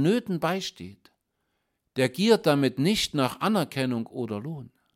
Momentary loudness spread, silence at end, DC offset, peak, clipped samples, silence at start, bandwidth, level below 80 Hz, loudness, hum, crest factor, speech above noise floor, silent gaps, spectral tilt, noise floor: 15 LU; 0.3 s; under 0.1%; -8 dBFS; under 0.1%; 0 s; 16.5 kHz; -60 dBFS; -26 LUFS; none; 20 dB; 52 dB; none; -5.5 dB/octave; -77 dBFS